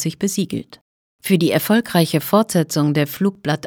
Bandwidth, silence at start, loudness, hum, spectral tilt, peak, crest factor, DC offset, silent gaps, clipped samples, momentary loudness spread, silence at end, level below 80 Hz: over 20 kHz; 0 s; -18 LUFS; none; -5.5 dB/octave; -2 dBFS; 16 dB; under 0.1%; 0.81-1.19 s; under 0.1%; 7 LU; 0 s; -60 dBFS